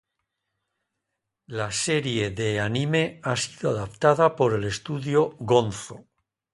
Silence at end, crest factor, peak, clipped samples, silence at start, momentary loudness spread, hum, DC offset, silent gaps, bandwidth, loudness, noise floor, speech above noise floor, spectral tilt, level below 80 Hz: 0.55 s; 22 dB; -4 dBFS; under 0.1%; 1.5 s; 10 LU; none; under 0.1%; none; 11.5 kHz; -24 LUFS; -82 dBFS; 58 dB; -5 dB/octave; -56 dBFS